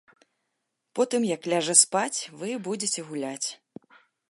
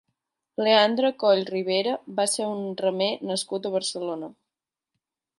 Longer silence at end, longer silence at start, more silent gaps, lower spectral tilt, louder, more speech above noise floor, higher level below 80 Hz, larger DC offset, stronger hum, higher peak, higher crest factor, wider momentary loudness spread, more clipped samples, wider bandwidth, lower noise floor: second, 0.75 s vs 1.05 s; first, 0.95 s vs 0.6 s; neither; about the same, -2 dB/octave vs -3 dB/octave; about the same, -25 LUFS vs -24 LUFS; second, 54 dB vs 64 dB; about the same, -82 dBFS vs -78 dBFS; neither; neither; first, -2 dBFS vs -6 dBFS; first, 26 dB vs 20 dB; first, 15 LU vs 12 LU; neither; about the same, 11.5 kHz vs 11.5 kHz; second, -80 dBFS vs -88 dBFS